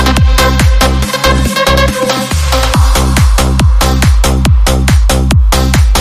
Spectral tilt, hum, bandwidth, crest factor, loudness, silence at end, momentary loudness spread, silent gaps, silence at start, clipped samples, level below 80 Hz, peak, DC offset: -4.5 dB/octave; none; 15.5 kHz; 8 dB; -9 LUFS; 0 s; 2 LU; none; 0 s; 0.2%; -10 dBFS; 0 dBFS; under 0.1%